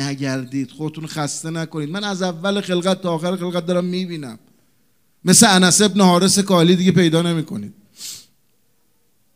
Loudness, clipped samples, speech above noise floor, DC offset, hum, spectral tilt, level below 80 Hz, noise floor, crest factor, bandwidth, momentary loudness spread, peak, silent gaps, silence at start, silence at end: -17 LUFS; under 0.1%; 48 dB; 0.2%; none; -4 dB/octave; -62 dBFS; -65 dBFS; 18 dB; 16 kHz; 19 LU; 0 dBFS; none; 0 s; 1.15 s